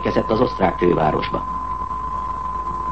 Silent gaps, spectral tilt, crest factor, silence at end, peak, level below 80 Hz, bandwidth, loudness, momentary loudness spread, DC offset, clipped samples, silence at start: none; -7.5 dB/octave; 16 dB; 0 s; -4 dBFS; -36 dBFS; 8.4 kHz; -21 LUFS; 8 LU; 0.9%; under 0.1%; 0 s